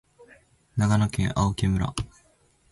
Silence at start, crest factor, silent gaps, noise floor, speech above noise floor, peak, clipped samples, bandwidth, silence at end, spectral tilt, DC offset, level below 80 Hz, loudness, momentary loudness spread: 0.75 s; 16 dB; none; -62 dBFS; 39 dB; -10 dBFS; under 0.1%; 11.5 kHz; 0.65 s; -6 dB/octave; under 0.1%; -40 dBFS; -25 LUFS; 12 LU